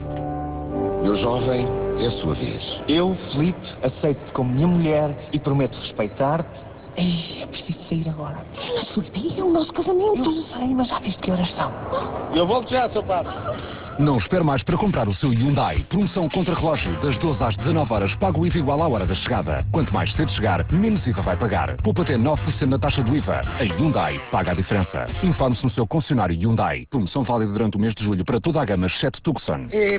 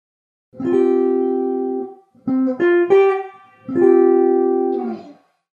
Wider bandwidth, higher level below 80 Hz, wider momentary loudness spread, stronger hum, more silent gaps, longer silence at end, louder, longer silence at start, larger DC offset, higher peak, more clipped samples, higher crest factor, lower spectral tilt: about the same, 4 kHz vs 4.1 kHz; first, -36 dBFS vs -74 dBFS; second, 7 LU vs 16 LU; neither; neither; second, 0 s vs 0.45 s; second, -22 LUFS vs -17 LUFS; second, 0 s vs 0.55 s; neither; second, -8 dBFS vs -2 dBFS; neither; about the same, 14 dB vs 14 dB; first, -11.5 dB/octave vs -8 dB/octave